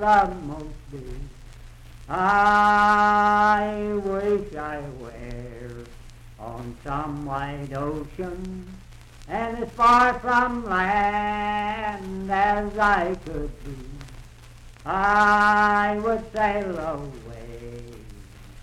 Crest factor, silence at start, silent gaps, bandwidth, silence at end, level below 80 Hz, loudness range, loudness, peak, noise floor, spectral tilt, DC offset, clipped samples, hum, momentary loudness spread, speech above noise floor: 18 dB; 0 s; none; 13 kHz; 0 s; -42 dBFS; 12 LU; -22 LUFS; -6 dBFS; -45 dBFS; -5.5 dB/octave; under 0.1%; under 0.1%; none; 22 LU; 22 dB